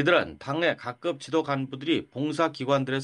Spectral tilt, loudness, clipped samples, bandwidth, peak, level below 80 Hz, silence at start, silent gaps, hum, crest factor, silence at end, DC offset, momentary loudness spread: -5.5 dB/octave; -27 LUFS; under 0.1%; 11 kHz; -8 dBFS; -64 dBFS; 0 s; none; none; 18 dB; 0 s; under 0.1%; 7 LU